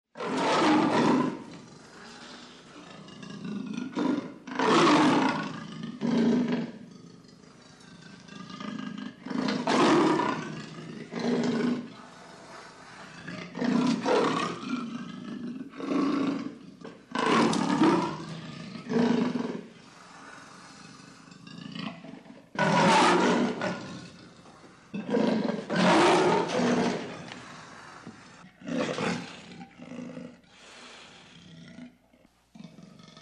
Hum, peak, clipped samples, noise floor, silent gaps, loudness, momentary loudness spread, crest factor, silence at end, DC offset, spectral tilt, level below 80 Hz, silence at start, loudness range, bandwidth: none; -10 dBFS; under 0.1%; -62 dBFS; none; -27 LUFS; 25 LU; 18 dB; 0 s; under 0.1%; -5 dB/octave; -70 dBFS; 0.15 s; 11 LU; 11 kHz